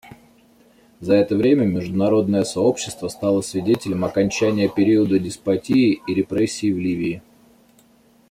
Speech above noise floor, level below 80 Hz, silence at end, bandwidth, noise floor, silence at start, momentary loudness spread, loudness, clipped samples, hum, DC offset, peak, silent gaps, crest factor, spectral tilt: 36 dB; -56 dBFS; 1.1 s; 15 kHz; -55 dBFS; 0.05 s; 7 LU; -20 LUFS; under 0.1%; none; under 0.1%; -4 dBFS; none; 16 dB; -6 dB/octave